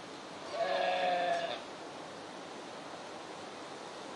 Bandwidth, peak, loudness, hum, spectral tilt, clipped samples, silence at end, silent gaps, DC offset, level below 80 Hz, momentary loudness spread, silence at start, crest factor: 11.5 kHz; -20 dBFS; -38 LUFS; none; -3 dB/octave; under 0.1%; 0 s; none; under 0.1%; -82 dBFS; 14 LU; 0 s; 18 dB